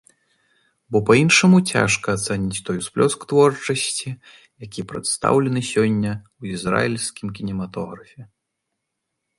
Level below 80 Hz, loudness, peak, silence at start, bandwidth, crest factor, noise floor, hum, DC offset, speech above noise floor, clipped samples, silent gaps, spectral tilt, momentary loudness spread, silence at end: -52 dBFS; -19 LUFS; -2 dBFS; 0.9 s; 11.5 kHz; 20 dB; -79 dBFS; none; under 0.1%; 59 dB; under 0.1%; none; -4.5 dB/octave; 17 LU; 1.15 s